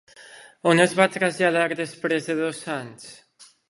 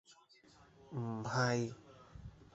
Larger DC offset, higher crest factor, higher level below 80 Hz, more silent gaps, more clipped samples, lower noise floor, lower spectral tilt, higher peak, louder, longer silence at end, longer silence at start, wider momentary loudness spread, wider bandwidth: neither; about the same, 22 dB vs 20 dB; second, -72 dBFS vs -66 dBFS; neither; neither; second, -47 dBFS vs -65 dBFS; about the same, -4.5 dB/octave vs -5 dB/octave; first, -2 dBFS vs -20 dBFS; first, -22 LUFS vs -38 LUFS; first, 0.25 s vs 0.1 s; about the same, 0.2 s vs 0.1 s; second, 16 LU vs 22 LU; first, 11.5 kHz vs 8 kHz